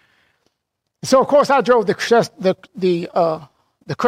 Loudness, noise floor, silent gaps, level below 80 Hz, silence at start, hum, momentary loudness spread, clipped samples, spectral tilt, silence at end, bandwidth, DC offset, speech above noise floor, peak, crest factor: -17 LUFS; -76 dBFS; none; -60 dBFS; 1.05 s; none; 10 LU; under 0.1%; -5 dB/octave; 0 s; 15.5 kHz; under 0.1%; 60 dB; -4 dBFS; 14 dB